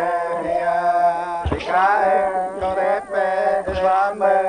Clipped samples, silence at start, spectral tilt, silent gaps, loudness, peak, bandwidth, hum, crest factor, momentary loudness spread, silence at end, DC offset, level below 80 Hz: under 0.1%; 0 s; -6 dB/octave; none; -19 LUFS; -4 dBFS; 9.8 kHz; none; 14 dB; 6 LU; 0 s; under 0.1%; -40 dBFS